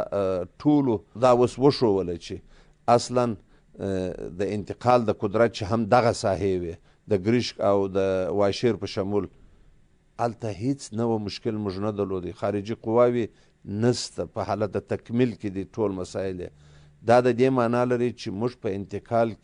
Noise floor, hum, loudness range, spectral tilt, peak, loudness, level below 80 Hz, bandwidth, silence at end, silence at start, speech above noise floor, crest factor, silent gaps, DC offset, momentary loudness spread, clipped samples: -57 dBFS; none; 5 LU; -6.5 dB/octave; -6 dBFS; -25 LUFS; -56 dBFS; 10.5 kHz; 0.1 s; 0 s; 33 dB; 18 dB; none; under 0.1%; 11 LU; under 0.1%